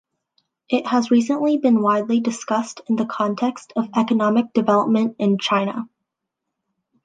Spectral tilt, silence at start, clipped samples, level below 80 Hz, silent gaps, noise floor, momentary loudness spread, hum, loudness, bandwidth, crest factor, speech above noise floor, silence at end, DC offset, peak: -5.5 dB/octave; 0.7 s; under 0.1%; -72 dBFS; none; -81 dBFS; 7 LU; none; -20 LUFS; 9.2 kHz; 16 dB; 62 dB; 1.2 s; under 0.1%; -4 dBFS